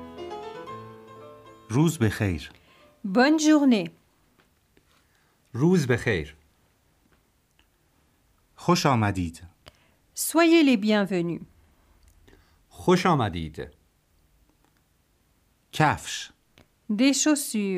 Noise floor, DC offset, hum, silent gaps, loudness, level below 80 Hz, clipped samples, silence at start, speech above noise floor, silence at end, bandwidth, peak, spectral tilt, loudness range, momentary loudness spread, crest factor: -66 dBFS; under 0.1%; none; none; -23 LUFS; -54 dBFS; under 0.1%; 0 s; 44 dB; 0 s; 15.5 kHz; -6 dBFS; -5 dB/octave; 6 LU; 21 LU; 22 dB